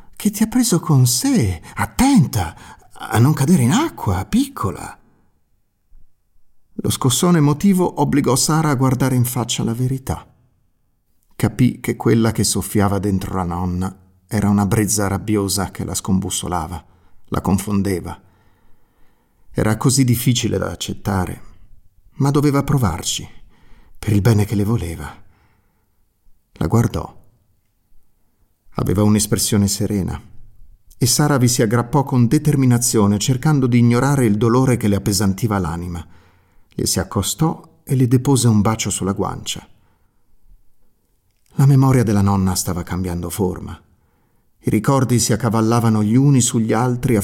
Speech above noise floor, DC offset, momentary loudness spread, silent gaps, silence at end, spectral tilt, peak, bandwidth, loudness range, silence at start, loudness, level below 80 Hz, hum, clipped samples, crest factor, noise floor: 45 dB; under 0.1%; 12 LU; none; 0 s; -5.5 dB/octave; -4 dBFS; 17 kHz; 6 LU; 0.1 s; -17 LUFS; -42 dBFS; none; under 0.1%; 14 dB; -61 dBFS